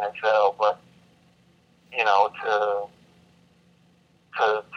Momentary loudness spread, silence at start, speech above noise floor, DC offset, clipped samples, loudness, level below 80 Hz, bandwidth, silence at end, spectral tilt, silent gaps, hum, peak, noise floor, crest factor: 14 LU; 0 s; 37 dB; under 0.1%; under 0.1%; -23 LUFS; -74 dBFS; 7 kHz; 0 s; -2.5 dB/octave; none; none; -6 dBFS; -60 dBFS; 20 dB